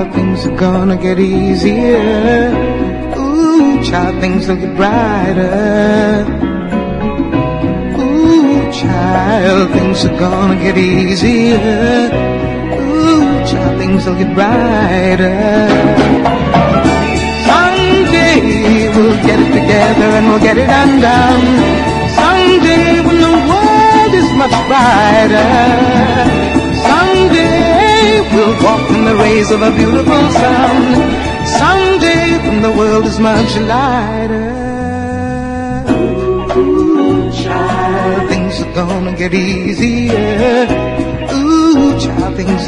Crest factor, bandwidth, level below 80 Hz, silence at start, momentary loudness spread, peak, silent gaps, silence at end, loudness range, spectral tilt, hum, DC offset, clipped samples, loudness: 10 dB; 10.5 kHz; -26 dBFS; 0 s; 7 LU; 0 dBFS; none; 0 s; 5 LU; -6 dB/octave; none; under 0.1%; 0.2%; -10 LUFS